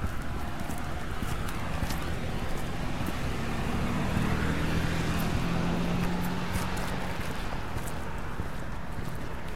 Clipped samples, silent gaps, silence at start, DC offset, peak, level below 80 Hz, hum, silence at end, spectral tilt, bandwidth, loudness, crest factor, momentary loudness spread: under 0.1%; none; 0 s; 2%; -14 dBFS; -38 dBFS; none; 0 s; -5.5 dB/octave; 16.5 kHz; -33 LUFS; 16 dB; 8 LU